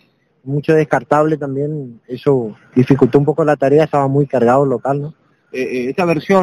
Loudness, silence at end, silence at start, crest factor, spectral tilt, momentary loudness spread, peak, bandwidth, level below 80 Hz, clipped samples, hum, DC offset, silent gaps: -15 LUFS; 0 s; 0.45 s; 14 dB; -8 dB/octave; 11 LU; 0 dBFS; 11 kHz; -52 dBFS; under 0.1%; none; under 0.1%; none